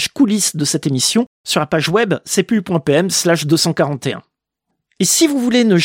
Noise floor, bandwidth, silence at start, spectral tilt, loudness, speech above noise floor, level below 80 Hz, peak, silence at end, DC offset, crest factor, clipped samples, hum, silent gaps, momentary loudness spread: -75 dBFS; 16.5 kHz; 0 s; -4 dB/octave; -15 LUFS; 60 dB; -56 dBFS; -2 dBFS; 0 s; under 0.1%; 14 dB; under 0.1%; none; 1.27-1.44 s; 6 LU